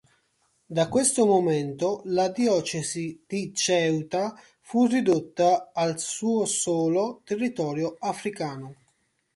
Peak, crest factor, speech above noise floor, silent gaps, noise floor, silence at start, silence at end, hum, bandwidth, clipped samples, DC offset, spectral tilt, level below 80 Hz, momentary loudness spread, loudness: -8 dBFS; 18 dB; 46 dB; none; -71 dBFS; 0.7 s; 0.6 s; none; 11.5 kHz; under 0.1%; under 0.1%; -4.5 dB/octave; -66 dBFS; 10 LU; -25 LUFS